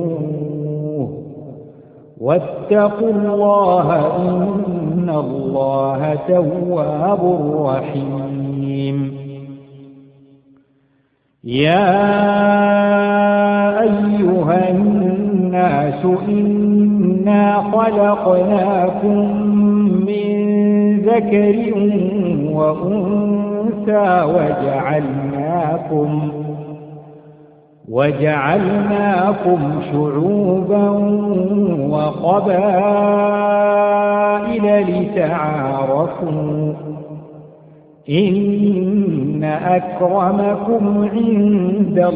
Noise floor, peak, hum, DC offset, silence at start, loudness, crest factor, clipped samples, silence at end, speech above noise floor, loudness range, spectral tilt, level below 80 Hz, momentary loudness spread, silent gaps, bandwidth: -61 dBFS; 0 dBFS; none; under 0.1%; 0 s; -16 LUFS; 16 dB; under 0.1%; 0 s; 46 dB; 6 LU; -12 dB/octave; -52 dBFS; 9 LU; none; 4.7 kHz